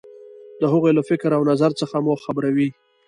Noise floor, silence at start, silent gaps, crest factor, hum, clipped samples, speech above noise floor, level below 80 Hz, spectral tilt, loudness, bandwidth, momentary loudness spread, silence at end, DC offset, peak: -42 dBFS; 0.15 s; none; 16 dB; none; under 0.1%; 23 dB; -66 dBFS; -7.5 dB/octave; -20 LUFS; 11 kHz; 5 LU; 0.35 s; under 0.1%; -4 dBFS